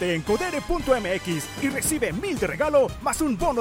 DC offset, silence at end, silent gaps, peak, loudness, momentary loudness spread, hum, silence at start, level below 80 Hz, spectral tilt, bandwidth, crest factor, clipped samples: under 0.1%; 0 s; none; -8 dBFS; -24 LUFS; 5 LU; none; 0 s; -40 dBFS; -4 dB/octave; 16.5 kHz; 16 dB; under 0.1%